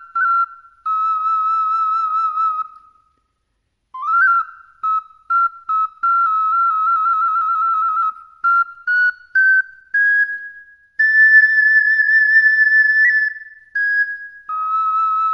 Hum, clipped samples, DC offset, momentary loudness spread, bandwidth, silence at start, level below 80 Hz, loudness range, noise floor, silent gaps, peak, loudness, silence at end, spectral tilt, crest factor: none; under 0.1%; under 0.1%; 13 LU; 5.6 kHz; 0 s; -70 dBFS; 8 LU; -70 dBFS; none; -2 dBFS; -15 LUFS; 0 s; 1.5 dB/octave; 14 dB